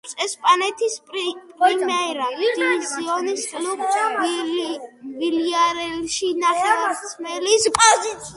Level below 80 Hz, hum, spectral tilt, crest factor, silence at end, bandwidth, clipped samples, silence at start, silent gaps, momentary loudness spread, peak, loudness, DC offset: -60 dBFS; none; -1 dB/octave; 20 dB; 0 s; 11.5 kHz; under 0.1%; 0.05 s; none; 9 LU; 0 dBFS; -20 LUFS; under 0.1%